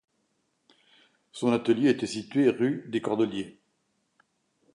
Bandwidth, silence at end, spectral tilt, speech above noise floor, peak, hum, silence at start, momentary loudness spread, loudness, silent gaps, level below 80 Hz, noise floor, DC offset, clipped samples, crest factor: 11 kHz; 1.25 s; -6 dB/octave; 49 dB; -10 dBFS; none; 1.35 s; 11 LU; -27 LUFS; none; -72 dBFS; -74 dBFS; under 0.1%; under 0.1%; 18 dB